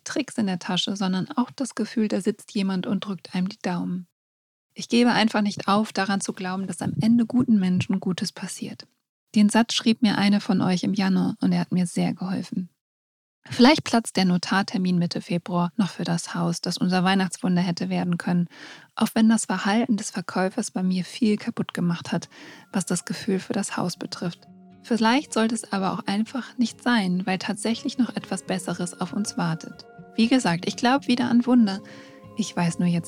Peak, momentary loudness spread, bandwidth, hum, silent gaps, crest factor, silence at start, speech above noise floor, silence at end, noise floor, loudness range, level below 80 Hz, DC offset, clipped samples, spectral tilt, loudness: -4 dBFS; 10 LU; 15 kHz; none; 4.12-4.70 s, 9.09-9.27 s, 12.81-13.42 s; 20 dB; 0.05 s; over 66 dB; 0 s; under -90 dBFS; 4 LU; -68 dBFS; under 0.1%; under 0.1%; -5 dB/octave; -24 LUFS